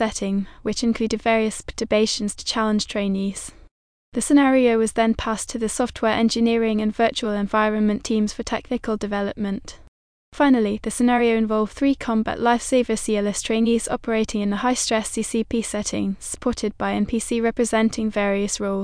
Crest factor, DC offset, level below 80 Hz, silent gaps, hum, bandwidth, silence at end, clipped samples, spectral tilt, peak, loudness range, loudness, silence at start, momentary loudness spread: 16 dB; under 0.1%; -44 dBFS; 3.71-4.12 s, 9.88-10.32 s; none; 10.5 kHz; 0 s; under 0.1%; -4.5 dB/octave; -6 dBFS; 3 LU; -22 LUFS; 0 s; 7 LU